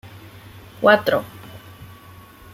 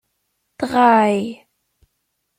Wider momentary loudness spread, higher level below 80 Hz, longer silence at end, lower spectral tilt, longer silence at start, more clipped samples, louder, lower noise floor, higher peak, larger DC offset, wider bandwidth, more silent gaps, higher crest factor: first, 27 LU vs 15 LU; first, -56 dBFS vs -62 dBFS; second, 0.7 s vs 1.05 s; about the same, -5.5 dB/octave vs -6 dB/octave; first, 0.8 s vs 0.6 s; neither; about the same, -18 LUFS vs -16 LUFS; second, -44 dBFS vs -73 dBFS; about the same, -2 dBFS vs -2 dBFS; neither; about the same, 16.5 kHz vs 15 kHz; neither; about the same, 22 dB vs 18 dB